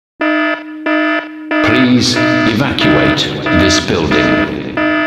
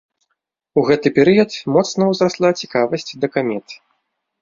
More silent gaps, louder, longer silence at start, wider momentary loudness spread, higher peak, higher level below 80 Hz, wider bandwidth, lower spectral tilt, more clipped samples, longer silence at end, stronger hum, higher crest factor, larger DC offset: neither; first, -12 LUFS vs -17 LUFS; second, 0.2 s vs 0.75 s; about the same, 7 LU vs 8 LU; about the same, 0 dBFS vs -2 dBFS; first, -36 dBFS vs -58 dBFS; first, 13 kHz vs 7.6 kHz; about the same, -4.5 dB/octave vs -5.5 dB/octave; neither; second, 0 s vs 0.65 s; neither; about the same, 12 dB vs 16 dB; neither